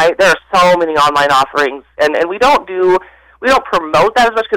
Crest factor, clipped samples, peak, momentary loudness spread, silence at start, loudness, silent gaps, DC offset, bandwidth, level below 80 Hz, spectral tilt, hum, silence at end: 8 dB; under 0.1%; -4 dBFS; 6 LU; 0 s; -12 LUFS; none; under 0.1%; 17.5 kHz; -42 dBFS; -3.5 dB/octave; none; 0 s